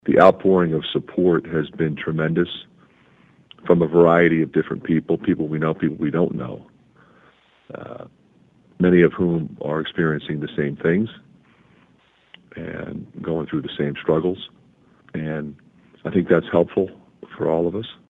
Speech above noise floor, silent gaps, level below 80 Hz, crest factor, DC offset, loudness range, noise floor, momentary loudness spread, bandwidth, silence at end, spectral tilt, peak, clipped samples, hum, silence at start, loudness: 38 dB; none; -54 dBFS; 22 dB; under 0.1%; 8 LU; -58 dBFS; 18 LU; 4.9 kHz; 0.2 s; -9.5 dB/octave; 0 dBFS; under 0.1%; none; 0.05 s; -21 LUFS